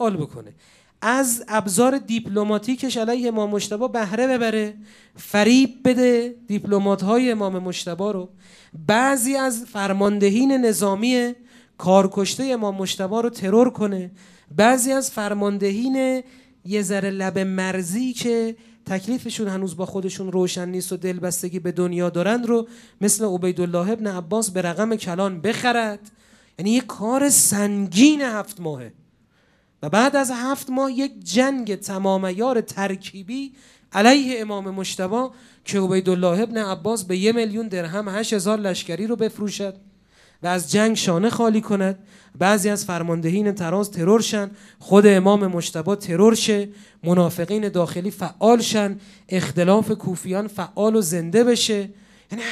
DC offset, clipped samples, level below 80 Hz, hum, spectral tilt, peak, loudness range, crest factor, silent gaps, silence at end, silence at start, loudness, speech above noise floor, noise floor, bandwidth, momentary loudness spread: under 0.1%; under 0.1%; -66 dBFS; none; -4.5 dB/octave; 0 dBFS; 5 LU; 20 dB; none; 0 s; 0 s; -21 LUFS; 40 dB; -61 dBFS; 15.5 kHz; 11 LU